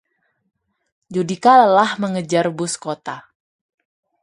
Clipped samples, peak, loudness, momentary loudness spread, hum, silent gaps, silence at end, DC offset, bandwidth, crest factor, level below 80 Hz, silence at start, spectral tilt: under 0.1%; 0 dBFS; -17 LUFS; 17 LU; none; none; 1.05 s; under 0.1%; 11.5 kHz; 20 dB; -68 dBFS; 1.1 s; -4.5 dB/octave